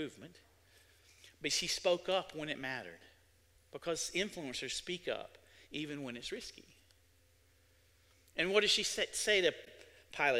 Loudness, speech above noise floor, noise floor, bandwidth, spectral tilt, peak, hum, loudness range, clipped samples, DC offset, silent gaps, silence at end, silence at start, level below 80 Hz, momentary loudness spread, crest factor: -36 LUFS; 32 dB; -69 dBFS; 16 kHz; -2 dB/octave; -14 dBFS; none; 9 LU; under 0.1%; under 0.1%; none; 0 s; 0 s; -68 dBFS; 20 LU; 24 dB